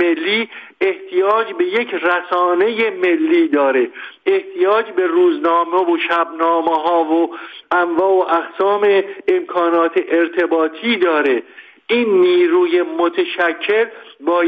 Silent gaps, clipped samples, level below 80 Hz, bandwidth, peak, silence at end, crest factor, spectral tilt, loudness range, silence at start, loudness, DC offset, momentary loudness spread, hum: none; under 0.1%; -68 dBFS; 4.9 kHz; -4 dBFS; 0 s; 12 dB; -6 dB/octave; 1 LU; 0 s; -16 LUFS; under 0.1%; 5 LU; none